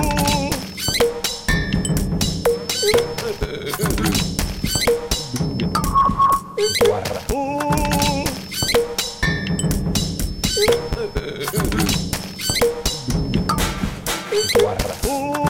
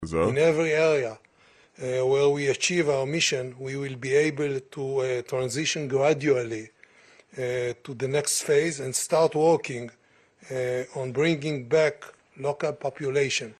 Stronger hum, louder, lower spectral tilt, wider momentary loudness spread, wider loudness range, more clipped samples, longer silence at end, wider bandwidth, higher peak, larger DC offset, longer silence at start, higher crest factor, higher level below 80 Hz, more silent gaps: neither; first, -20 LUFS vs -25 LUFS; about the same, -4 dB/octave vs -4 dB/octave; second, 7 LU vs 11 LU; about the same, 2 LU vs 3 LU; neither; about the same, 0 s vs 0.1 s; first, 17 kHz vs 13 kHz; first, 0 dBFS vs -10 dBFS; neither; about the same, 0 s vs 0 s; about the same, 20 dB vs 16 dB; first, -30 dBFS vs -60 dBFS; neither